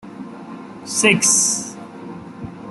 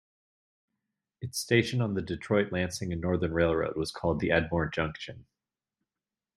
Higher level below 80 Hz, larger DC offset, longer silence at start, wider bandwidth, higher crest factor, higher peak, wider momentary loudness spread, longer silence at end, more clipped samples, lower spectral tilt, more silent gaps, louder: second, -60 dBFS vs -54 dBFS; neither; second, 0.05 s vs 1.2 s; second, 12.5 kHz vs 16 kHz; about the same, 20 dB vs 22 dB; first, -2 dBFS vs -10 dBFS; first, 22 LU vs 9 LU; second, 0 s vs 1.15 s; neither; second, -2 dB/octave vs -5.5 dB/octave; neither; first, -15 LUFS vs -29 LUFS